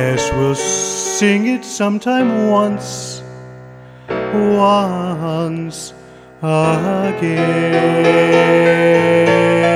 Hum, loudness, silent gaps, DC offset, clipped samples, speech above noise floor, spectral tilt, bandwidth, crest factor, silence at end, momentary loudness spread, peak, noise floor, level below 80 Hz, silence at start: none; -14 LUFS; none; under 0.1%; under 0.1%; 23 dB; -5 dB/octave; 14.5 kHz; 14 dB; 0 s; 14 LU; 0 dBFS; -37 dBFS; -44 dBFS; 0 s